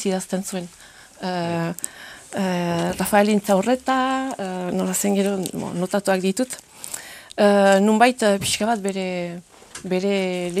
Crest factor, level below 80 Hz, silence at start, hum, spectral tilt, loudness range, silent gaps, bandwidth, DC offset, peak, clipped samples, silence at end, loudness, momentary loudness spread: 20 dB; -58 dBFS; 0 s; none; -4.5 dB/octave; 4 LU; none; 15.5 kHz; under 0.1%; 0 dBFS; under 0.1%; 0 s; -21 LUFS; 16 LU